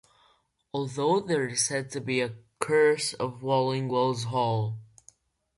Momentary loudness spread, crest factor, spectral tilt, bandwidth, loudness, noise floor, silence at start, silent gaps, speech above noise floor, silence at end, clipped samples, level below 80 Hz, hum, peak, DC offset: 11 LU; 22 dB; -4.5 dB/octave; 11.5 kHz; -27 LUFS; -67 dBFS; 0.75 s; none; 40 dB; 0.75 s; under 0.1%; -68 dBFS; none; -6 dBFS; under 0.1%